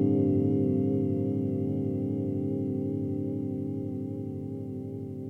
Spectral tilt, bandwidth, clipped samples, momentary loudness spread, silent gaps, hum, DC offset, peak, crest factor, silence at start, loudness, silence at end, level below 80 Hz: -12 dB/octave; 3.2 kHz; under 0.1%; 11 LU; none; 50 Hz at -45 dBFS; under 0.1%; -14 dBFS; 14 dB; 0 s; -30 LUFS; 0 s; -74 dBFS